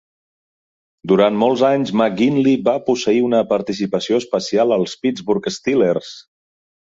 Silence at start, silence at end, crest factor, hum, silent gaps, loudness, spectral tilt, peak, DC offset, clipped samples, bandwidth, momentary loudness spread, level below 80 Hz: 1.05 s; 0.65 s; 16 dB; none; none; -17 LUFS; -5.5 dB/octave; -2 dBFS; under 0.1%; under 0.1%; 7.8 kHz; 6 LU; -58 dBFS